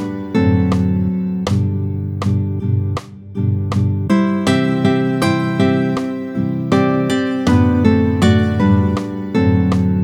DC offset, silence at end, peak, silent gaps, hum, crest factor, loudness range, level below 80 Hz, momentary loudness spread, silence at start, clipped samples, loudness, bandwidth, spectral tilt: under 0.1%; 0 s; 0 dBFS; none; none; 14 dB; 4 LU; -42 dBFS; 7 LU; 0 s; under 0.1%; -16 LUFS; 12 kHz; -7.5 dB/octave